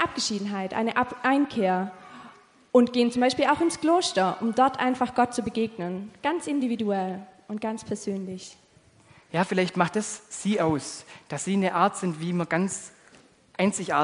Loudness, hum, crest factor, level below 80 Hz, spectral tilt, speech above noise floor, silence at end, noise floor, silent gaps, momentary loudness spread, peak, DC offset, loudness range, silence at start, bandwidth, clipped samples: -26 LUFS; none; 20 dB; -64 dBFS; -4.5 dB/octave; 32 dB; 0 s; -58 dBFS; none; 14 LU; -6 dBFS; under 0.1%; 7 LU; 0 s; 10.5 kHz; under 0.1%